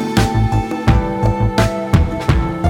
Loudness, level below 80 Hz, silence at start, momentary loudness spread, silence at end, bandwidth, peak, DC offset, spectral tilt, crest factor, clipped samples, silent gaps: -16 LUFS; -22 dBFS; 0 s; 2 LU; 0 s; 16.5 kHz; 0 dBFS; under 0.1%; -6.5 dB/octave; 14 dB; under 0.1%; none